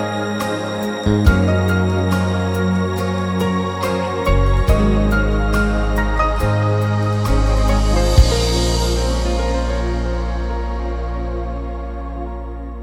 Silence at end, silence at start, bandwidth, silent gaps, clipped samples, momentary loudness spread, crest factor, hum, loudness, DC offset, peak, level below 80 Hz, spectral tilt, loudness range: 0 s; 0 s; 16 kHz; none; under 0.1%; 9 LU; 16 dB; none; -18 LUFS; under 0.1%; 0 dBFS; -20 dBFS; -6 dB/octave; 5 LU